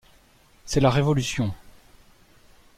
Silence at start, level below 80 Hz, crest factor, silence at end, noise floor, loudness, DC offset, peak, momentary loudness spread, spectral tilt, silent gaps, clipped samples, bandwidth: 0.65 s; -44 dBFS; 20 dB; 1.05 s; -57 dBFS; -23 LUFS; under 0.1%; -8 dBFS; 21 LU; -5.5 dB/octave; none; under 0.1%; 15 kHz